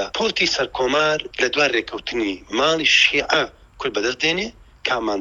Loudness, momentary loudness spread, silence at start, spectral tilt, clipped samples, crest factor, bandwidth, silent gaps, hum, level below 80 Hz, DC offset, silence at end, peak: -19 LUFS; 12 LU; 0 s; -2.5 dB/octave; under 0.1%; 20 dB; 11 kHz; none; none; -50 dBFS; under 0.1%; 0 s; -2 dBFS